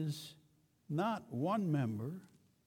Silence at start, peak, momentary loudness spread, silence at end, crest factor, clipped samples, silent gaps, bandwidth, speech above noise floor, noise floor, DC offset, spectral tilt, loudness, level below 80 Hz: 0 s; -24 dBFS; 13 LU; 0.4 s; 14 dB; under 0.1%; none; 17.5 kHz; 34 dB; -71 dBFS; under 0.1%; -7 dB/octave; -38 LUFS; -80 dBFS